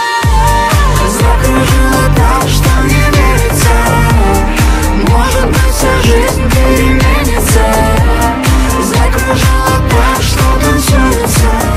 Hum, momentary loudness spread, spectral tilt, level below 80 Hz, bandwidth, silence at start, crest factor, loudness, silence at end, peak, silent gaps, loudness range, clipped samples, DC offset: none; 2 LU; -5 dB/octave; -12 dBFS; 16 kHz; 0 s; 8 dB; -9 LUFS; 0 s; 0 dBFS; none; 1 LU; 0.1%; under 0.1%